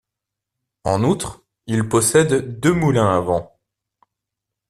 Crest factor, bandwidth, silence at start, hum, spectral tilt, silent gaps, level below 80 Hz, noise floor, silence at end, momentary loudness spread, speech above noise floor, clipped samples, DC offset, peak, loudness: 18 dB; 13.5 kHz; 0.85 s; none; -5.5 dB/octave; none; -48 dBFS; -84 dBFS; 1.25 s; 10 LU; 66 dB; under 0.1%; under 0.1%; -2 dBFS; -18 LUFS